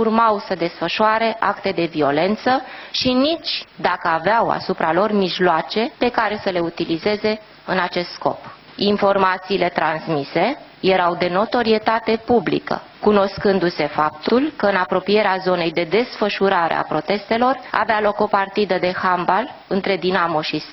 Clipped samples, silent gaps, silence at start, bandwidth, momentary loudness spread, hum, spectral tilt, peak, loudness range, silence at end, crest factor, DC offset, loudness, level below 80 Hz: under 0.1%; none; 0 s; 6.2 kHz; 5 LU; none; -6.5 dB/octave; 0 dBFS; 2 LU; 0 s; 18 dB; under 0.1%; -19 LUFS; -52 dBFS